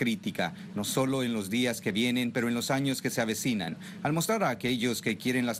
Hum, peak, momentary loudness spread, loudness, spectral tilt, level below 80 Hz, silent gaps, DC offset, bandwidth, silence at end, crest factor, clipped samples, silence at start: none; -16 dBFS; 5 LU; -29 LUFS; -4.5 dB/octave; -66 dBFS; none; under 0.1%; 16 kHz; 0 s; 14 dB; under 0.1%; 0 s